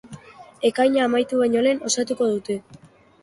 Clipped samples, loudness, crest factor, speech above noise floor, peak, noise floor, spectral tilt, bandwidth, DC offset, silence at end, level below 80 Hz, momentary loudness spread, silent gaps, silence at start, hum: under 0.1%; -21 LUFS; 16 dB; 23 dB; -6 dBFS; -43 dBFS; -3.5 dB/octave; 11.5 kHz; under 0.1%; 0.45 s; -64 dBFS; 8 LU; none; 0.05 s; none